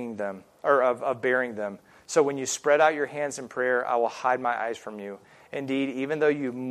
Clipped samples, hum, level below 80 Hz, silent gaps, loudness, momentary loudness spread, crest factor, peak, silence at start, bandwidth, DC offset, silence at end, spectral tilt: under 0.1%; none; -76 dBFS; none; -26 LUFS; 14 LU; 20 dB; -6 dBFS; 0 s; 14 kHz; under 0.1%; 0 s; -4 dB/octave